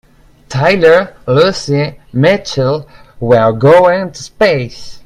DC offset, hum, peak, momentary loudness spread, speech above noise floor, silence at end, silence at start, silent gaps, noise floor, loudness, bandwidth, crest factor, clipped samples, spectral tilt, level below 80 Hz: under 0.1%; none; 0 dBFS; 12 LU; 25 dB; 0.05 s; 0.5 s; none; -36 dBFS; -11 LUFS; 11.5 kHz; 12 dB; 0.1%; -6 dB/octave; -42 dBFS